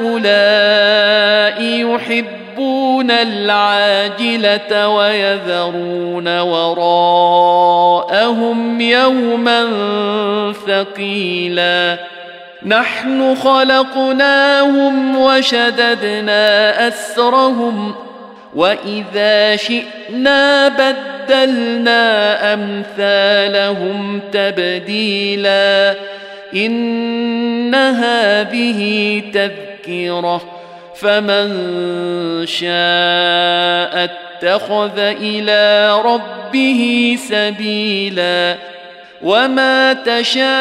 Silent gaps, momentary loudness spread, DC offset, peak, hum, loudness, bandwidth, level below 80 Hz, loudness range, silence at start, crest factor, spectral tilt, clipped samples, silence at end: none; 9 LU; under 0.1%; -2 dBFS; none; -13 LUFS; 14 kHz; -64 dBFS; 4 LU; 0 s; 12 dB; -4 dB/octave; under 0.1%; 0 s